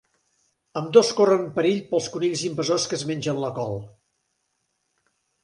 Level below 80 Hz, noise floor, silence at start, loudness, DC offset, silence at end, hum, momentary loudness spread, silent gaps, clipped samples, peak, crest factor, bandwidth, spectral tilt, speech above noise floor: -64 dBFS; -74 dBFS; 0.75 s; -23 LUFS; under 0.1%; 1.55 s; none; 13 LU; none; under 0.1%; -2 dBFS; 22 dB; 11.5 kHz; -4.5 dB/octave; 52 dB